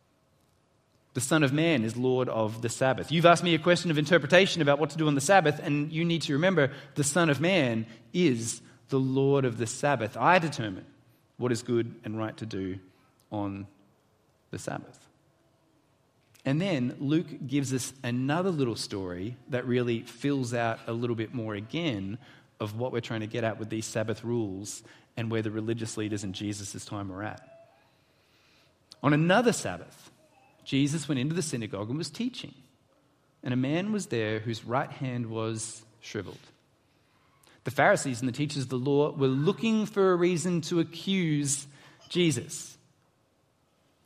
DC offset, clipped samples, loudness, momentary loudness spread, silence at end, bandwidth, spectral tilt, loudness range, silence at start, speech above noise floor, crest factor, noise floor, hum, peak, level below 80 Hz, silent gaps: under 0.1%; under 0.1%; -28 LUFS; 15 LU; 1.3 s; 15 kHz; -5 dB/octave; 11 LU; 1.15 s; 41 dB; 26 dB; -69 dBFS; none; -4 dBFS; -70 dBFS; none